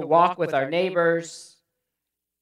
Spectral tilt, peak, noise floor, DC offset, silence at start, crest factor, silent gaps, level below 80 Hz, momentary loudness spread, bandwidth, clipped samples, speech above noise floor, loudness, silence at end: -5 dB/octave; -6 dBFS; -84 dBFS; under 0.1%; 0 s; 18 dB; none; -80 dBFS; 16 LU; 11.5 kHz; under 0.1%; 62 dB; -22 LUFS; 0.95 s